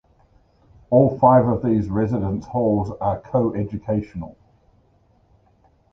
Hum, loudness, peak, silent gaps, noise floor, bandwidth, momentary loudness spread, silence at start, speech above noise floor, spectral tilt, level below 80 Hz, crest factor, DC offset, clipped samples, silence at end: none; -20 LUFS; -2 dBFS; none; -59 dBFS; 6.6 kHz; 11 LU; 0.9 s; 39 dB; -11 dB/octave; -44 dBFS; 20 dB; under 0.1%; under 0.1%; 1.6 s